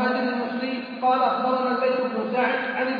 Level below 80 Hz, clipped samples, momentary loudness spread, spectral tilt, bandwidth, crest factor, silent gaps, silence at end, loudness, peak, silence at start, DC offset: -76 dBFS; under 0.1%; 6 LU; -7 dB/octave; 5.2 kHz; 16 dB; none; 0 s; -24 LUFS; -8 dBFS; 0 s; under 0.1%